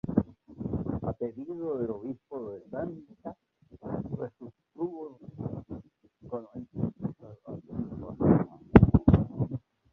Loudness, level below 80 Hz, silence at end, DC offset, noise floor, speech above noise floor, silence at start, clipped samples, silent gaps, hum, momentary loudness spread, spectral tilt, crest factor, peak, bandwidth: -30 LUFS; -42 dBFS; 0.35 s; under 0.1%; -54 dBFS; 18 dB; 0.05 s; under 0.1%; none; none; 22 LU; -12 dB/octave; 28 dB; -2 dBFS; 4 kHz